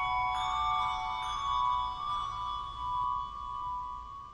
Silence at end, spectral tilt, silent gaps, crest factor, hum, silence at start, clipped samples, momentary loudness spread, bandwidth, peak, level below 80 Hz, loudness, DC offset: 0 s; -2.5 dB/octave; none; 14 dB; none; 0 s; under 0.1%; 8 LU; 10.5 kHz; -20 dBFS; -50 dBFS; -33 LUFS; under 0.1%